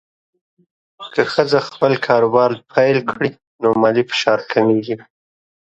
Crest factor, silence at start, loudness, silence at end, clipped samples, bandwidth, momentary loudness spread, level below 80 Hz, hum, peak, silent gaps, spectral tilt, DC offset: 18 dB; 1 s; -17 LUFS; 0.7 s; under 0.1%; 8.2 kHz; 9 LU; -60 dBFS; none; 0 dBFS; 3.47-3.59 s; -6 dB/octave; under 0.1%